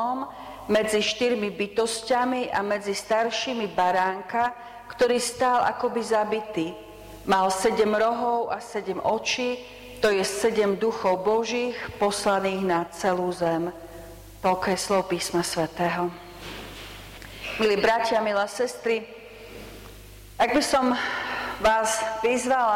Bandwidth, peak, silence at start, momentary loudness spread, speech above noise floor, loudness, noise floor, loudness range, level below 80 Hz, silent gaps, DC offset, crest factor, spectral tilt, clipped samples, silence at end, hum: 16.5 kHz; -12 dBFS; 0 s; 18 LU; 20 dB; -25 LUFS; -45 dBFS; 2 LU; -52 dBFS; none; under 0.1%; 14 dB; -3.5 dB/octave; under 0.1%; 0 s; none